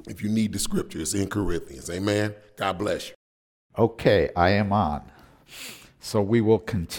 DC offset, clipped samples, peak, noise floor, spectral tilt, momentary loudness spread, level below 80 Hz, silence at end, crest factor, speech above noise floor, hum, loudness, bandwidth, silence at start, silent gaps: under 0.1%; under 0.1%; -4 dBFS; under -90 dBFS; -5.5 dB/octave; 18 LU; -44 dBFS; 0 s; 20 dB; over 66 dB; none; -25 LUFS; 18 kHz; 0.05 s; 3.15-3.70 s